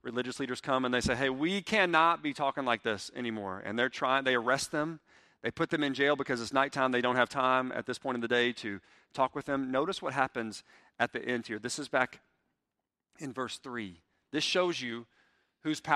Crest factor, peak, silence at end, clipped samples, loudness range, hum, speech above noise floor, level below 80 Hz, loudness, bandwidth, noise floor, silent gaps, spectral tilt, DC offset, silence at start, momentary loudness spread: 24 dB; -10 dBFS; 0 s; under 0.1%; 6 LU; none; 56 dB; -64 dBFS; -31 LUFS; 13.5 kHz; -88 dBFS; none; -4 dB/octave; under 0.1%; 0.05 s; 12 LU